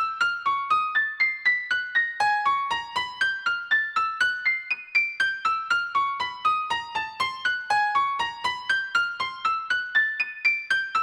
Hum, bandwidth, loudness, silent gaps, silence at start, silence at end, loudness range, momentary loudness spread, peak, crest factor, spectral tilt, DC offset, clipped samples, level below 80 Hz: none; over 20 kHz; -24 LUFS; none; 0 s; 0 s; 2 LU; 5 LU; -10 dBFS; 14 dB; 0 dB/octave; under 0.1%; under 0.1%; -68 dBFS